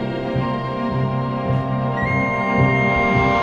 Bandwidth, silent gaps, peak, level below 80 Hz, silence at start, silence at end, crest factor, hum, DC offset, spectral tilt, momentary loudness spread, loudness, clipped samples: 6.8 kHz; none; -4 dBFS; -38 dBFS; 0 s; 0 s; 14 dB; none; under 0.1%; -8 dB/octave; 7 LU; -19 LUFS; under 0.1%